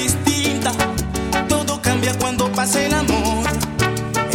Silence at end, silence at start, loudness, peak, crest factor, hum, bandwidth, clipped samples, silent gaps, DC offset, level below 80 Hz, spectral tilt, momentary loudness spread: 0 s; 0 s; -19 LUFS; 0 dBFS; 18 dB; none; 18 kHz; under 0.1%; none; under 0.1%; -32 dBFS; -4 dB/octave; 4 LU